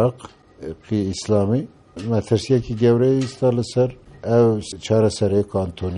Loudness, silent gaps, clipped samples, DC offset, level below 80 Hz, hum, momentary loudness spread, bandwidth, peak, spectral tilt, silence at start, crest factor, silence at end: -20 LUFS; none; under 0.1%; under 0.1%; -48 dBFS; none; 13 LU; 11 kHz; -4 dBFS; -7 dB/octave; 0 s; 16 dB; 0 s